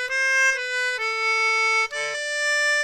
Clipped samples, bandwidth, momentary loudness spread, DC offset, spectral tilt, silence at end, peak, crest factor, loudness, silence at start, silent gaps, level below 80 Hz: under 0.1%; 16 kHz; 6 LU; under 0.1%; 3.5 dB/octave; 0 s; -12 dBFS; 10 dB; -21 LUFS; 0 s; none; -64 dBFS